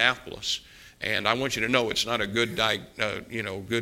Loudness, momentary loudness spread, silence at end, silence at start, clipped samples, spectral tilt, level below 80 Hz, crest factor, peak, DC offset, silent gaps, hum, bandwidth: -27 LUFS; 8 LU; 0 s; 0 s; under 0.1%; -3 dB/octave; -56 dBFS; 24 dB; -4 dBFS; under 0.1%; none; none; 17 kHz